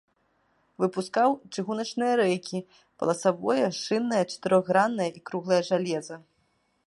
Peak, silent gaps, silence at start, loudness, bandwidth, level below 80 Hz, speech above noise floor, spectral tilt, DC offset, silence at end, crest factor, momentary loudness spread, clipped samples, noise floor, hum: -8 dBFS; none; 0.8 s; -27 LUFS; 11.5 kHz; -76 dBFS; 45 dB; -5 dB/octave; under 0.1%; 0.65 s; 20 dB; 9 LU; under 0.1%; -71 dBFS; none